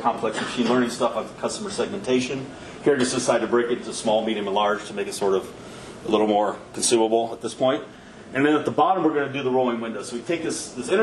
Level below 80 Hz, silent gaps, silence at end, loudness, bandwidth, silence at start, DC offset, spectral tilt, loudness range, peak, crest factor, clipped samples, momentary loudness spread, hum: -58 dBFS; none; 0 s; -23 LUFS; 12.5 kHz; 0 s; under 0.1%; -4 dB/octave; 2 LU; -6 dBFS; 18 dB; under 0.1%; 10 LU; none